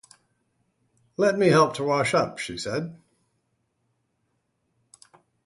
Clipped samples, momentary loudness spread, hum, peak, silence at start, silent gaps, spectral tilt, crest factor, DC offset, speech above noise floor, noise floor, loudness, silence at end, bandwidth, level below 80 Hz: under 0.1%; 13 LU; none; -6 dBFS; 1.2 s; none; -5 dB/octave; 22 dB; under 0.1%; 51 dB; -74 dBFS; -23 LUFS; 2.5 s; 11.5 kHz; -64 dBFS